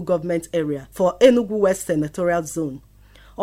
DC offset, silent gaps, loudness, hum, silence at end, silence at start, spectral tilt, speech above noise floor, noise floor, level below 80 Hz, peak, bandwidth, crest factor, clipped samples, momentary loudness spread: under 0.1%; none; -20 LUFS; 50 Hz at -45 dBFS; 0 s; 0 s; -5.5 dB/octave; 28 dB; -48 dBFS; -50 dBFS; -2 dBFS; 16 kHz; 20 dB; under 0.1%; 12 LU